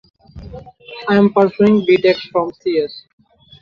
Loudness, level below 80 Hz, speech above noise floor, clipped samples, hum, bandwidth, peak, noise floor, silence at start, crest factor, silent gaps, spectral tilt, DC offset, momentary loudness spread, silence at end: -15 LUFS; -48 dBFS; 21 dB; under 0.1%; none; 6.4 kHz; -2 dBFS; -35 dBFS; 0.35 s; 14 dB; none; -8 dB/octave; under 0.1%; 23 LU; 0.6 s